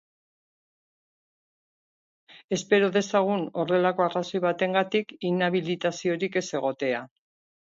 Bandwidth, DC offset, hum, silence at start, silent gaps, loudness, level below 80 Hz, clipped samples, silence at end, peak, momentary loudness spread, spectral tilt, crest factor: 7.8 kHz; under 0.1%; none; 2.3 s; 2.44-2.48 s; -26 LUFS; -74 dBFS; under 0.1%; 0.65 s; -8 dBFS; 7 LU; -5 dB/octave; 20 dB